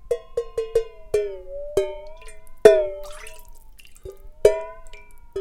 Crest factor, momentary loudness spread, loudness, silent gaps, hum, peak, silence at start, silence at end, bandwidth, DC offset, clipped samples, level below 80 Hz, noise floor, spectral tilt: 24 dB; 27 LU; -22 LUFS; none; none; 0 dBFS; 0.05 s; 0 s; 16 kHz; under 0.1%; under 0.1%; -42 dBFS; -43 dBFS; -4.5 dB/octave